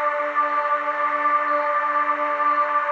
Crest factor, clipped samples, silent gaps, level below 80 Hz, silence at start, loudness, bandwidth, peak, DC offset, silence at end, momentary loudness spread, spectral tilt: 12 dB; under 0.1%; none; under -90 dBFS; 0 s; -21 LUFS; 7 kHz; -10 dBFS; under 0.1%; 0 s; 2 LU; -3 dB/octave